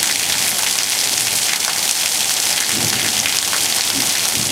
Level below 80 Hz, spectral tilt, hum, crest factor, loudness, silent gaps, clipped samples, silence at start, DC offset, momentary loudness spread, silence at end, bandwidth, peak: -54 dBFS; 0.5 dB/octave; none; 18 dB; -15 LUFS; none; under 0.1%; 0 s; under 0.1%; 1 LU; 0 s; over 20 kHz; 0 dBFS